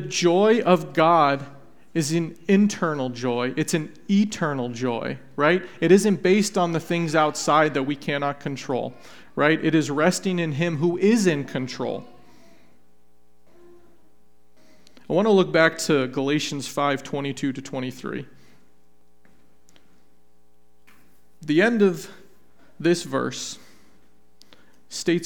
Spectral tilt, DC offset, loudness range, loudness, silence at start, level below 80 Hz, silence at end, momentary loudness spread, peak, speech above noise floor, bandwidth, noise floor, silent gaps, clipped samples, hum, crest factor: -5 dB/octave; 0.5%; 11 LU; -22 LUFS; 0 s; -66 dBFS; 0 s; 13 LU; -2 dBFS; 42 dB; 18 kHz; -64 dBFS; none; under 0.1%; none; 22 dB